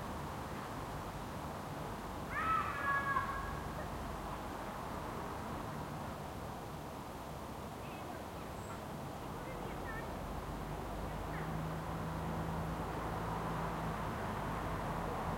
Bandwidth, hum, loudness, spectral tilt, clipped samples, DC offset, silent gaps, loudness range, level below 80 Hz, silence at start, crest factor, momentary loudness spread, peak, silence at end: 16.5 kHz; none; -42 LUFS; -5.5 dB/octave; under 0.1%; under 0.1%; none; 7 LU; -52 dBFS; 0 s; 18 dB; 10 LU; -24 dBFS; 0 s